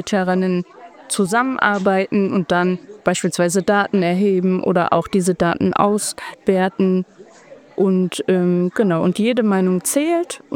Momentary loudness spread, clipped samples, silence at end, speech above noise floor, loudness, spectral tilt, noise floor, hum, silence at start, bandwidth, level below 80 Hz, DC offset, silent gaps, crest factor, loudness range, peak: 5 LU; under 0.1%; 0 s; 26 dB; -18 LUFS; -5.5 dB/octave; -44 dBFS; none; 0 s; 16.5 kHz; -56 dBFS; under 0.1%; none; 18 dB; 2 LU; 0 dBFS